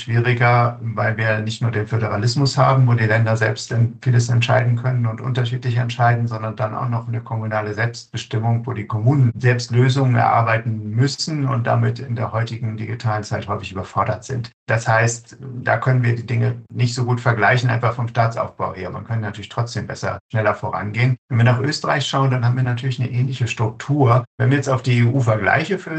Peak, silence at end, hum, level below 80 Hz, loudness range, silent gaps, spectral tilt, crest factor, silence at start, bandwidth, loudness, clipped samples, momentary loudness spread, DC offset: -2 dBFS; 0 s; none; -56 dBFS; 5 LU; 14.53-14.66 s, 20.20-20.29 s, 21.18-21.28 s, 24.27-24.38 s; -6 dB/octave; 16 dB; 0 s; 8.6 kHz; -19 LUFS; under 0.1%; 9 LU; under 0.1%